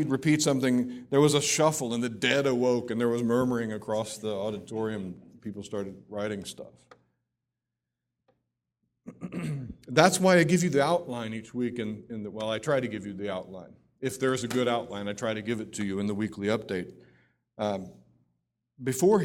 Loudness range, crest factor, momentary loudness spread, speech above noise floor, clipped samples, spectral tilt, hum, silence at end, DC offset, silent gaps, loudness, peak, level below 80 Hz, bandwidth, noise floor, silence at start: 14 LU; 26 dB; 15 LU; 59 dB; under 0.1%; -4.5 dB/octave; none; 0 s; under 0.1%; none; -28 LUFS; -2 dBFS; -64 dBFS; 16.5 kHz; -87 dBFS; 0 s